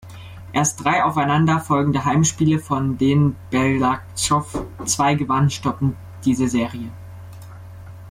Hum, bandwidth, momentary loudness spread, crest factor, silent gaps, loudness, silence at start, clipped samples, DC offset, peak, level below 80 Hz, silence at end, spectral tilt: none; 15.5 kHz; 21 LU; 14 dB; none; -20 LUFS; 0.05 s; under 0.1%; under 0.1%; -6 dBFS; -46 dBFS; 0 s; -5 dB/octave